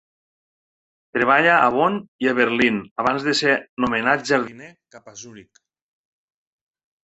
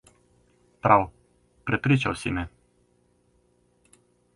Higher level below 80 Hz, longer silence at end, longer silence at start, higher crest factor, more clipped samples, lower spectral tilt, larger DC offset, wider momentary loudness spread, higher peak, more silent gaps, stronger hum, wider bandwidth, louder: second, -60 dBFS vs -50 dBFS; second, 1.6 s vs 1.85 s; first, 1.15 s vs 0.85 s; about the same, 20 dB vs 24 dB; neither; second, -4.5 dB/octave vs -6.5 dB/octave; neither; about the same, 13 LU vs 15 LU; about the same, -2 dBFS vs -4 dBFS; first, 2.08-2.19 s, 2.91-2.96 s, 3.69-3.77 s vs none; second, none vs 60 Hz at -55 dBFS; second, 8.2 kHz vs 11.5 kHz; first, -19 LUFS vs -25 LUFS